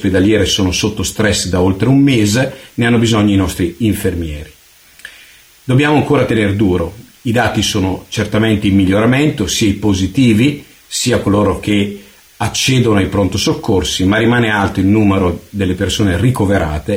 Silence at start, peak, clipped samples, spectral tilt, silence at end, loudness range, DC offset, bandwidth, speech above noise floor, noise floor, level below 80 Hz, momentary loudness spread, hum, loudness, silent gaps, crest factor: 0 s; -2 dBFS; under 0.1%; -5 dB/octave; 0 s; 3 LU; under 0.1%; over 20 kHz; 30 dB; -43 dBFS; -34 dBFS; 7 LU; none; -13 LUFS; none; 12 dB